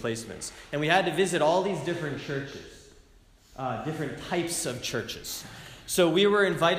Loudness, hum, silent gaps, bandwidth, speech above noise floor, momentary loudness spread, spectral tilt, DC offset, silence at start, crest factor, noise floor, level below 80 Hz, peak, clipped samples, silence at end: -27 LUFS; none; none; 15.5 kHz; 30 dB; 16 LU; -4 dB/octave; under 0.1%; 0 s; 20 dB; -57 dBFS; -56 dBFS; -8 dBFS; under 0.1%; 0 s